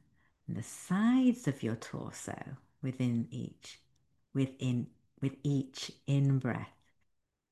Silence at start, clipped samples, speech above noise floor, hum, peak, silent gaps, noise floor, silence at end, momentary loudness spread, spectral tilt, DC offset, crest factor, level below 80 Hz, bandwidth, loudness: 0.5 s; under 0.1%; 45 dB; none; -18 dBFS; none; -79 dBFS; 0.85 s; 16 LU; -6.5 dB/octave; under 0.1%; 18 dB; -70 dBFS; 12.5 kHz; -34 LUFS